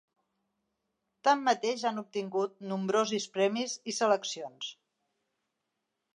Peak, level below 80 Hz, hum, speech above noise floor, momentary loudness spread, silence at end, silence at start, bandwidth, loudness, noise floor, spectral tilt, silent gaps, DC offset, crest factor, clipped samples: -12 dBFS; -88 dBFS; none; 54 dB; 11 LU; 1.4 s; 1.25 s; 11 kHz; -31 LUFS; -84 dBFS; -3.5 dB/octave; none; under 0.1%; 20 dB; under 0.1%